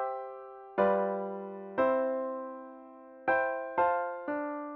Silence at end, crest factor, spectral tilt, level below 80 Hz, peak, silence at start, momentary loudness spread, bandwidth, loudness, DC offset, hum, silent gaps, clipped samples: 0 s; 18 dB; -8.5 dB/octave; -72 dBFS; -14 dBFS; 0 s; 17 LU; 4.4 kHz; -32 LUFS; under 0.1%; none; none; under 0.1%